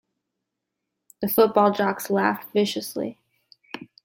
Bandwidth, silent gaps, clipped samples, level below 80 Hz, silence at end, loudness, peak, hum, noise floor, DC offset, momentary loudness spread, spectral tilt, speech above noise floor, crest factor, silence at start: 17 kHz; none; under 0.1%; -68 dBFS; 0.2 s; -23 LUFS; -4 dBFS; none; -82 dBFS; under 0.1%; 19 LU; -5 dB/octave; 60 dB; 20 dB; 1.2 s